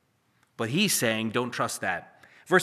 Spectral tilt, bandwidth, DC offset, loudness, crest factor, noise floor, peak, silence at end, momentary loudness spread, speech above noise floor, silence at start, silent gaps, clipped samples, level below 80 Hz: -3.5 dB/octave; 15 kHz; under 0.1%; -27 LUFS; 22 dB; -68 dBFS; -6 dBFS; 0 s; 9 LU; 41 dB; 0.6 s; none; under 0.1%; -74 dBFS